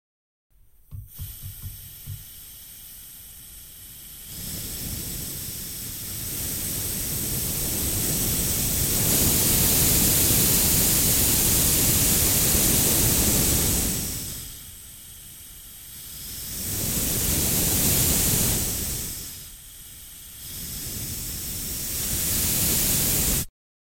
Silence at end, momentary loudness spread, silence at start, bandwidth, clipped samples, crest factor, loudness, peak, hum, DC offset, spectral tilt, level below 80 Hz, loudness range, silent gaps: 0.5 s; 22 LU; 0.9 s; 17 kHz; under 0.1%; 18 dB; -21 LUFS; -6 dBFS; none; under 0.1%; -2.5 dB/octave; -38 dBFS; 17 LU; none